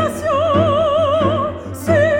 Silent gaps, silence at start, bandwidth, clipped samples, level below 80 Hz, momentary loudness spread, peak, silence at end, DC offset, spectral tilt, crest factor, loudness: none; 0 s; 17 kHz; under 0.1%; -42 dBFS; 7 LU; -2 dBFS; 0 s; 0.3%; -6.5 dB/octave; 12 dB; -16 LUFS